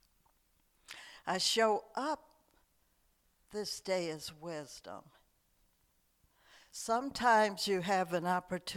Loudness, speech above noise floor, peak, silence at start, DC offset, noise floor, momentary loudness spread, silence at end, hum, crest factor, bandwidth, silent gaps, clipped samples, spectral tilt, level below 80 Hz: -34 LUFS; 40 dB; -16 dBFS; 0.9 s; under 0.1%; -74 dBFS; 21 LU; 0 s; none; 20 dB; 18.5 kHz; none; under 0.1%; -3 dB/octave; -72 dBFS